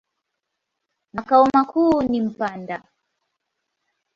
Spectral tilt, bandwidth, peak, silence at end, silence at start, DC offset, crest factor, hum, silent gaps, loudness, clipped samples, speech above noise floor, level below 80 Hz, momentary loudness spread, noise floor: -7 dB/octave; 7.6 kHz; -2 dBFS; 1.4 s; 1.15 s; under 0.1%; 20 dB; none; none; -19 LUFS; under 0.1%; 61 dB; -56 dBFS; 18 LU; -80 dBFS